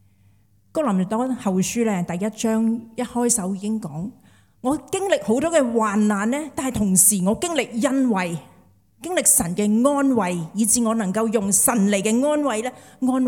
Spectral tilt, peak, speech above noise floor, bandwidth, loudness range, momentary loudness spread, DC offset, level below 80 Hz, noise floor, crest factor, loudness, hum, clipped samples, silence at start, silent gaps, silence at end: -4 dB/octave; -2 dBFS; 37 dB; 18 kHz; 5 LU; 11 LU; under 0.1%; -54 dBFS; -58 dBFS; 20 dB; -20 LUFS; none; under 0.1%; 0.75 s; none; 0 s